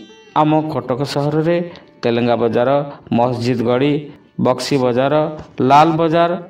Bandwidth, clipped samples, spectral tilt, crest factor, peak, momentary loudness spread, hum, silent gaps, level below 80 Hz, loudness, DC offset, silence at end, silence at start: 15.5 kHz; under 0.1%; -7 dB/octave; 16 dB; 0 dBFS; 8 LU; none; none; -54 dBFS; -16 LUFS; under 0.1%; 0 s; 0 s